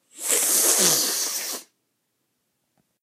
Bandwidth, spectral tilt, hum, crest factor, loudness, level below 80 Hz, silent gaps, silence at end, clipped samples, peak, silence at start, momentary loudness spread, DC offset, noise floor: 16 kHz; 0 dB/octave; none; 24 dB; -19 LUFS; -84 dBFS; none; 1.4 s; under 0.1%; -2 dBFS; 0.15 s; 13 LU; under 0.1%; -75 dBFS